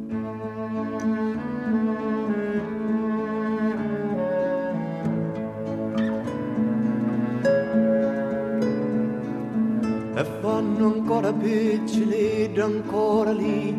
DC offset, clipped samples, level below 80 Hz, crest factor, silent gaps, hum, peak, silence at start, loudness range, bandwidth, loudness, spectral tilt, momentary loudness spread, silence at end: under 0.1%; under 0.1%; -60 dBFS; 14 dB; none; none; -10 dBFS; 0 s; 3 LU; 10 kHz; -25 LUFS; -7.5 dB/octave; 6 LU; 0 s